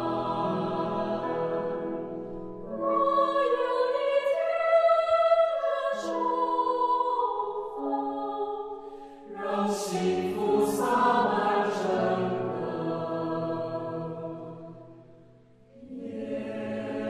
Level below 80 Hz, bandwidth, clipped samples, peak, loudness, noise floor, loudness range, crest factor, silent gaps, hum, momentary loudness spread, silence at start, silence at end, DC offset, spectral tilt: -64 dBFS; 14.5 kHz; under 0.1%; -12 dBFS; -28 LUFS; -56 dBFS; 10 LU; 16 dB; none; none; 15 LU; 0 s; 0 s; under 0.1%; -5.5 dB/octave